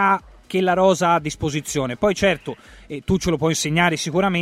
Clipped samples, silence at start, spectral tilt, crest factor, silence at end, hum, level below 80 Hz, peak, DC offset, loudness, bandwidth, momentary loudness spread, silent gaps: under 0.1%; 0 s; -4.5 dB/octave; 16 dB; 0 s; none; -44 dBFS; -4 dBFS; under 0.1%; -20 LUFS; 15.5 kHz; 10 LU; none